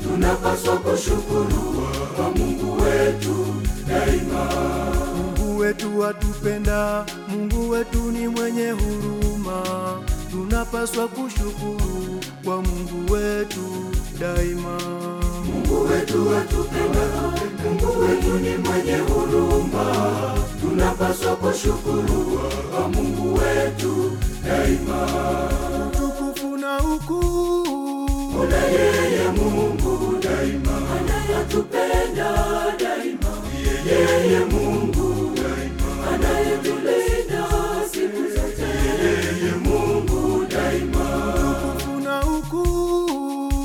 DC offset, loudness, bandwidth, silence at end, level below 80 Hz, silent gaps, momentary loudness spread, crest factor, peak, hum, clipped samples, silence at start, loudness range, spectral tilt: under 0.1%; -22 LUFS; 17.5 kHz; 0 s; -28 dBFS; none; 6 LU; 14 dB; -6 dBFS; none; under 0.1%; 0 s; 4 LU; -5.5 dB/octave